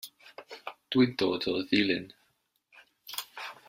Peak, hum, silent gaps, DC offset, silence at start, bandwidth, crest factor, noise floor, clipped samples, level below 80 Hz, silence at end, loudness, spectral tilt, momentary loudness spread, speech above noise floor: -10 dBFS; none; none; under 0.1%; 0.05 s; 16 kHz; 22 dB; -74 dBFS; under 0.1%; -70 dBFS; 0.15 s; -29 LUFS; -5 dB/octave; 22 LU; 46 dB